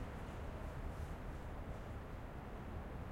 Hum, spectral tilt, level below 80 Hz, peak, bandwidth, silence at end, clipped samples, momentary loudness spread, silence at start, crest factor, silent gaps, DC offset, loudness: none; -7 dB/octave; -50 dBFS; -34 dBFS; 16 kHz; 0 s; under 0.1%; 2 LU; 0 s; 12 dB; none; under 0.1%; -49 LUFS